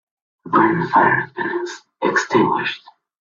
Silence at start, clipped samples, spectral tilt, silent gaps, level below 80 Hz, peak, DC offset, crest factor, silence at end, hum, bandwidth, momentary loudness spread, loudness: 0.45 s; under 0.1%; -5.5 dB/octave; none; -60 dBFS; 0 dBFS; under 0.1%; 18 dB; 0.45 s; none; 7.6 kHz; 11 LU; -18 LUFS